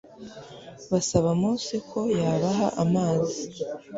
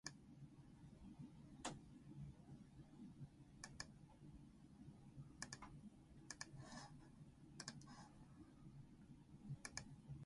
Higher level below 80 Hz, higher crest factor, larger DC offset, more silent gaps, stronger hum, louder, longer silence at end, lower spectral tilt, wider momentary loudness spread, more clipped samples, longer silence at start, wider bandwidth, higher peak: first, -54 dBFS vs -72 dBFS; second, 18 dB vs 28 dB; neither; neither; neither; first, -26 LUFS vs -59 LUFS; about the same, 0 s vs 0 s; first, -6 dB/octave vs -4 dB/octave; first, 20 LU vs 10 LU; neither; about the same, 0.1 s vs 0.05 s; second, 8 kHz vs 11.5 kHz; first, -8 dBFS vs -32 dBFS